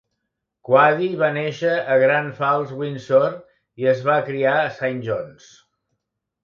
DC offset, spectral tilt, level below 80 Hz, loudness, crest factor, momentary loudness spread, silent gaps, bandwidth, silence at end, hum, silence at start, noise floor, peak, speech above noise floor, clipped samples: under 0.1%; -6.5 dB/octave; -66 dBFS; -20 LUFS; 18 dB; 11 LU; none; 7 kHz; 1.1 s; none; 0.7 s; -78 dBFS; -2 dBFS; 59 dB; under 0.1%